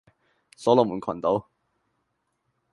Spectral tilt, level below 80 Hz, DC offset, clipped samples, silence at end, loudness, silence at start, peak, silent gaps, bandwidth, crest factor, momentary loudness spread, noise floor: -7 dB/octave; -64 dBFS; under 0.1%; under 0.1%; 1.3 s; -24 LUFS; 0.6 s; -4 dBFS; none; 11.5 kHz; 24 dB; 8 LU; -76 dBFS